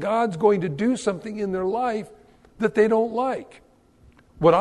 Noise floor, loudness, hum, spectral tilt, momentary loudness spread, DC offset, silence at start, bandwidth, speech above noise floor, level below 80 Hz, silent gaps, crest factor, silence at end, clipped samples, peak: -55 dBFS; -23 LUFS; none; -6.5 dB/octave; 9 LU; under 0.1%; 0 s; 11 kHz; 32 dB; -56 dBFS; none; 18 dB; 0 s; under 0.1%; -6 dBFS